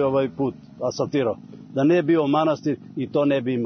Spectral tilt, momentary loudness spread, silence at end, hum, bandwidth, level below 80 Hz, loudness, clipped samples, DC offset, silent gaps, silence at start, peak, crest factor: -7 dB/octave; 10 LU; 0 s; none; 6.6 kHz; -64 dBFS; -23 LUFS; under 0.1%; under 0.1%; none; 0 s; -8 dBFS; 14 dB